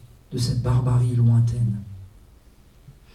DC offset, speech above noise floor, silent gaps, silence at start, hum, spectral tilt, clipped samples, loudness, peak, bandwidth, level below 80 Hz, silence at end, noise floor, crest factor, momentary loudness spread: under 0.1%; 31 dB; none; 0.3 s; none; -7.5 dB/octave; under 0.1%; -22 LUFS; -10 dBFS; 11 kHz; -42 dBFS; 0.25 s; -51 dBFS; 14 dB; 16 LU